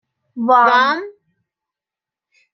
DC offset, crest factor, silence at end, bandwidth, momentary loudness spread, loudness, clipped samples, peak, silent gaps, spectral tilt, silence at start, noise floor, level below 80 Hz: under 0.1%; 18 dB; 1.45 s; 6.4 kHz; 24 LU; -14 LUFS; under 0.1%; -2 dBFS; none; -4 dB/octave; 0.35 s; -88 dBFS; -76 dBFS